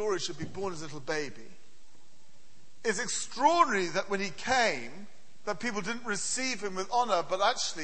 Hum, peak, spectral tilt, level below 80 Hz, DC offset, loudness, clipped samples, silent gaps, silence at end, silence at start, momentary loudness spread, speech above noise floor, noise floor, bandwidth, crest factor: none; -10 dBFS; -2.5 dB/octave; -66 dBFS; 1%; -30 LUFS; under 0.1%; none; 0 s; 0 s; 12 LU; 32 dB; -63 dBFS; 8.8 kHz; 22 dB